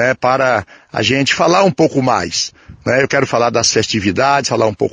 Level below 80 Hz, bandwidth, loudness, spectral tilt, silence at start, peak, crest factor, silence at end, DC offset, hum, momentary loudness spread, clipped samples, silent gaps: -48 dBFS; 9.8 kHz; -14 LUFS; -4 dB/octave; 0 s; 0 dBFS; 14 dB; 0.05 s; under 0.1%; none; 7 LU; under 0.1%; none